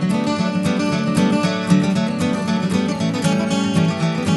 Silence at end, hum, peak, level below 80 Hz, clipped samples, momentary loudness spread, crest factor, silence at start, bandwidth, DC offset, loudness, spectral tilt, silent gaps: 0 s; none; -4 dBFS; -52 dBFS; under 0.1%; 3 LU; 14 dB; 0 s; 11.5 kHz; under 0.1%; -19 LUFS; -6 dB/octave; none